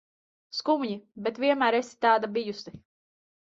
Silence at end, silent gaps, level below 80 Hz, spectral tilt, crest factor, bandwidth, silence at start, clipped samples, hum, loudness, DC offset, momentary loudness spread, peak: 0.6 s; none; -70 dBFS; -4.5 dB/octave; 20 dB; 8 kHz; 0.55 s; under 0.1%; none; -27 LUFS; under 0.1%; 13 LU; -8 dBFS